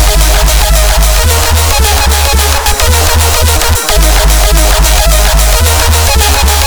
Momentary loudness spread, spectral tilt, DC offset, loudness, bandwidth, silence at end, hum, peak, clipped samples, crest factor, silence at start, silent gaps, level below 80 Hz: 1 LU; -2.5 dB/octave; 3%; -7 LUFS; over 20 kHz; 0 s; none; 0 dBFS; 0.2%; 6 dB; 0 s; none; -8 dBFS